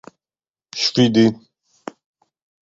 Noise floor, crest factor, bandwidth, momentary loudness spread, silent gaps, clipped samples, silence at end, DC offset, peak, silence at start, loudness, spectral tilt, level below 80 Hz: under -90 dBFS; 18 dB; 7.8 kHz; 23 LU; none; under 0.1%; 1.35 s; under 0.1%; -2 dBFS; 0.75 s; -17 LUFS; -5 dB/octave; -60 dBFS